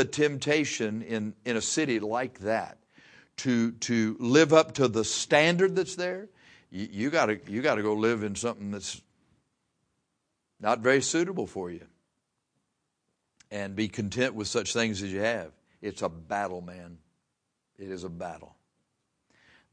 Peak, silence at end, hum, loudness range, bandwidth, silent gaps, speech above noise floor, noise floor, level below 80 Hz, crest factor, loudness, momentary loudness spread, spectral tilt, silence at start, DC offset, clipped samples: -6 dBFS; 1.3 s; none; 10 LU; 10.5 kHz; none; 53 dB; -81 dBFS; -66 dBFS; 24 dB; -28 LUFS; 18 LU; -4 dB/octave; 0 s; under 0.1%; under 0.1%